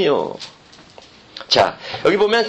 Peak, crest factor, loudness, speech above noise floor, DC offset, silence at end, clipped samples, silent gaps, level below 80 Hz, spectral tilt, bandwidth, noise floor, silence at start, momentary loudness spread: 0 dBFS; 18 dB; -18 LUFS; 27 dB; under 0.1%; 0 s; under 0.1%; none; -56 dBFS; -4 dB/octave; 8.8 kHz; -45 dBFS; 0 s; 21 LU